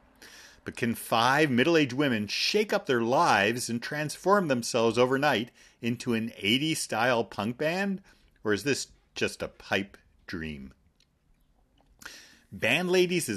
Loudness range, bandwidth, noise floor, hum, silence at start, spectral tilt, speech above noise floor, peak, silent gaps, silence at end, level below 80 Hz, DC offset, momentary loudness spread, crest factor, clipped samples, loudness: 10 LU; 13.5 kHz; -67 dBFS; none; 0.2 s; -4 dB/octave; 40 dB; -8 dBFS; none; 0 s; -62 dBFS; under 0.1%; 16 LU; 20 dB; under 0.1%; -27 LUFS